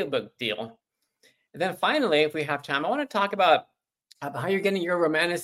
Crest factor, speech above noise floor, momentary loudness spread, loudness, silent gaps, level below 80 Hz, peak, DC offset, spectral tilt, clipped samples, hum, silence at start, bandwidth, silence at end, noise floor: 20 dB; 40 dB; 10 LU; -25 LUFS; none; -74 dBFS; -8 dBFS; under 0.1%; -4.5 dB/octave; under 0.1%; none; 0 s; 16 kHz; 0 s; -65 dBFS